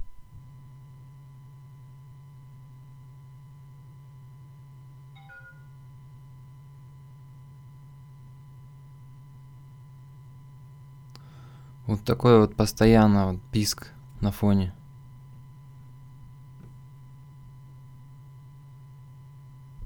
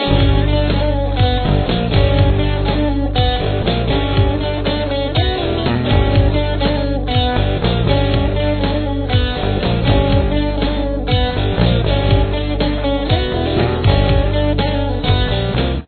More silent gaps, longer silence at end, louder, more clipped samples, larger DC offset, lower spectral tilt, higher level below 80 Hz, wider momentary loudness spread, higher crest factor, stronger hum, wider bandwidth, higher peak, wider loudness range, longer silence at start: neither; about the same, 0 s vs 0 s; second, -23 LUFS vs -16 LUFS; neither; neither; second, -6.5 dB/octave vs -10 dB/octave; second, -48 dBFS vs -20 dBFS; first, 26 LU vs 4 LU; first, 26 dB vs 14 dB; neither; first, 19.5 kHz vs 4.5 kHz; second, -4 dBFS vs 0 dBFS; first, 25 LU vs 1 LU; about the same, 0 s vs 0 s